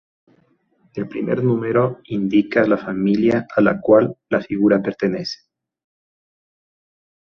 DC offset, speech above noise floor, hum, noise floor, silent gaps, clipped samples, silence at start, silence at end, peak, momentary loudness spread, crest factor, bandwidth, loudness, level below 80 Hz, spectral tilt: under 0.1%; 43 dB; none; -61 dBFS; none; under 0.1%; 0.95 s; 2 s; -2 dBFS; 12 LU; 18 dB; 6.8 kHz; -18 LUFS; -58 dBFS; -8 dB/octave